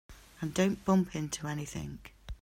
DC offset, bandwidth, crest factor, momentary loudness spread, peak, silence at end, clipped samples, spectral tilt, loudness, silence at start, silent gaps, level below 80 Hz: under 0.1%; 15.5 kHz; 18 dB; 16 LU; -16 dBFS; 0.1 s; under 0.1%; -5.5 dB/octave; -33 LUFS; 0.1 s; none; -52 dBFS